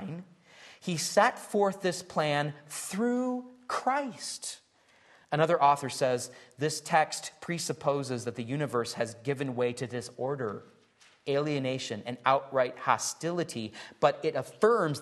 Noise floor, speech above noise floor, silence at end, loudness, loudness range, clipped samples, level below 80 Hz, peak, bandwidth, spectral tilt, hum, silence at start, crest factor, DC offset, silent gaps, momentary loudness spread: -63 dBFS; 33 dB; 0 s; -30 LUFS; 4 LU; under 0.1%; -76 dBFS; -10 dBFS; 12.5 kHz; -4.5 dB/octave; none; 0 s; 22 dB; under 0.1%; none; 12 LU